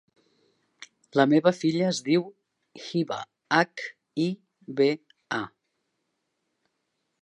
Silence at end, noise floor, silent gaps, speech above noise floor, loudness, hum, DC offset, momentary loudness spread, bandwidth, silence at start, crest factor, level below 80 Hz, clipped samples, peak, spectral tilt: 1.75 s; -78 dBFS; none; 54 dB; -26 LUFS; none; under 0.1%; 16 LU; 10.5 kHz; 0.8 s; 22 dB; -76 dBFS; under 0.1%; -6 dBFS; -5.5 dB/octave